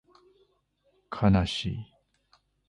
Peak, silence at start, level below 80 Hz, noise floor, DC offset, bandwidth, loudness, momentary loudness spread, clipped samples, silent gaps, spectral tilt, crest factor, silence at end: -10 dBFS; 1.1 s; -44 dBFS; -71 dBFS; under 0.1%; 11 kHz; -27 LUFS; 18 LU; under 0.1%; none; -6.5 dB/octave; 20 dB; 0.85 s